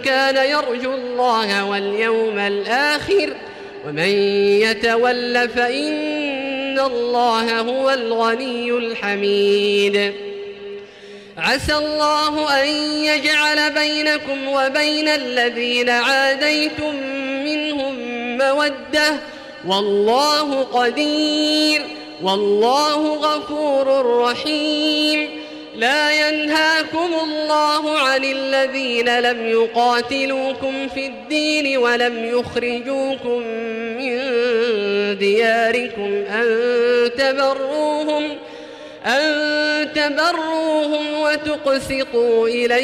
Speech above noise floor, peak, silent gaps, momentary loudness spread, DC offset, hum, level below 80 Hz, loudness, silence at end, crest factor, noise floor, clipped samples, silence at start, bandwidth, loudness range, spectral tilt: 21 dB; -6 dBFS; none; 8 LU; under 0.1%; none; -52 dBFS; -18 LUFS; 0 s; 12 dB; -39 dBFS; under 0.1%; 0 s; 16 kHz; 3 LU; -3 dB/octave